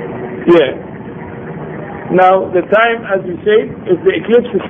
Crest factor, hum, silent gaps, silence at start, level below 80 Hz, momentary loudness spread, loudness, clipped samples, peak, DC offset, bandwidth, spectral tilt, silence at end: 14 dB; none; none; 0 s; -48 dBFS; 17 LU; -12 LUFS; under 0.1%; 0 dBFS; under 0.1%; 3.8 kHz; -8.5 dB/octave; 0 s